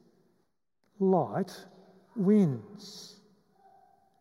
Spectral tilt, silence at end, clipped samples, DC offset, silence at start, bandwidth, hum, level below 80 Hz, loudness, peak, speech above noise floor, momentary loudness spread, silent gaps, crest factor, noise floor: -8 dB/octave; 1.15 s; under 0.1%; under 0.1%; 1 s; 12 kHz; none; -84 dBFS; -28 LUFS; -14 dBFS; 49 dB; 22 LU; none; 18 dB; -77 dBFS